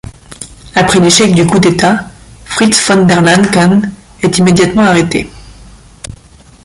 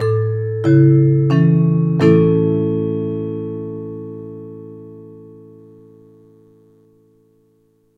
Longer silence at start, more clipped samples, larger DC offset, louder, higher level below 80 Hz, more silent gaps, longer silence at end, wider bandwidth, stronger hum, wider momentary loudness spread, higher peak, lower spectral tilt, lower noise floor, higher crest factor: about the same, 0.05 s vs 0 s; neither; neither; first, -9 LUFS vs -15 LUFS; first, -36 dBFS vs -54 dBFS; neither; second, 0.5 s vs 2.7 s; first, 11.5 kHz vs 4.9 kHz; neither; about the same, 22 LU vs 22 LU; about the same, 0 dBFS vs 0 dBFS; second, -4.5 dB/octave vs -10.5 dB/octave; second, -39 dBFS vs -58 dBFS; second, 10 dB vs 16 dB